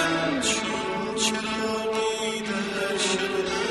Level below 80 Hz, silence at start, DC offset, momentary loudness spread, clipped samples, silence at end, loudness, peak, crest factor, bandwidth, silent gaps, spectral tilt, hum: -56 dBFS; 0 s; under 0.1%; 4 LU; under 0.1%; 0 s; -25 LUFS; -12 dBFS; 14 dB; 13 kHz; none; -2.5 dB/octave; none